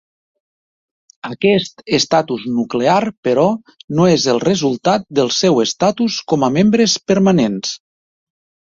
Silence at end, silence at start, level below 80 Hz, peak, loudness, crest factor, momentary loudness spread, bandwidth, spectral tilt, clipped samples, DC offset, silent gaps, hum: 0.9 s; 1.25 s; -54 dBFS; -2 dBFS; -15 LUFS; 16 dB; 8 LU; 7.8 kHz; -5 dB/octave; under 0.1%; under 0.1%; 3.17-3.23 s, 3.84-3.88 s; none